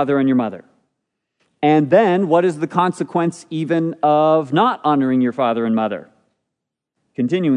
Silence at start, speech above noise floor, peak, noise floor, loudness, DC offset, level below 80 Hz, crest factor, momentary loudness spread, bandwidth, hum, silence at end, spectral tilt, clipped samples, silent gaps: 0 s; 64 dB; 0 dBFS; -80 dBFS; -17 LUFS; under 0.1%; -72 dBFS; 16 dB; 9 LU; 10.5 kHz; none; 0 s; -7.5 dB/octave; under 0.1%; none